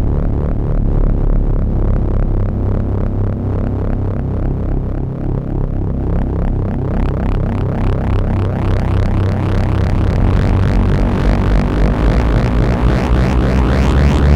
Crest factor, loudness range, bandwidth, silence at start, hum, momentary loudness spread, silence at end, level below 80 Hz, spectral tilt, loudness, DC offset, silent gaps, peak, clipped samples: 12 dB; 5 LU; 8 kHz; 0 s; none; 5 LU; 0 s; -16 dBFS; -8.5 dB/octave; -16 LUFS; 2%; none; -2 dBFS; under 0.1%